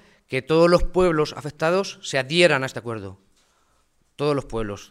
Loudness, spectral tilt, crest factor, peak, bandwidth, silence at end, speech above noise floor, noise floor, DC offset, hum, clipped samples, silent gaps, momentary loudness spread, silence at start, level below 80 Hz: -22 LUFS; -5 dB/octave; 20 dB; -2 dBFS; 13.5 kHz; 0.05 s; 43 dB; -64 dBFS; under 0.1%; none; under 0.1%; none; 13 LU; 0.3 s; -36 dBFS